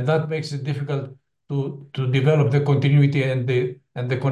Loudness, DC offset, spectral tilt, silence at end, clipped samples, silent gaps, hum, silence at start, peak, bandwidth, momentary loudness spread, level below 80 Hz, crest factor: -22 LUFS; under 0.1%; -8 dB/octave; 0 s; under 0.1%; none; none; 0 s; -6 dBFS; 8.6 kHz; 11 LU; -62 dBFS; 16 dB